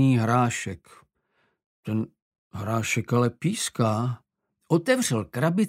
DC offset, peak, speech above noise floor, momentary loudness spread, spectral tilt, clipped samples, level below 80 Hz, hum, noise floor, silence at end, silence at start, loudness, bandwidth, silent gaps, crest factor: under 0.1%; -8 dBFS; 47 dB; 15 LU; -5.5 dB/octave; under 0.1%; -62 dBFS; none; -71 dBFS; 0 s; 0 s; -25 LUFS; 16 kHz; 1.66-1.83 s, 2.22-2.31 s, 2.38-2.51 s; 18 dB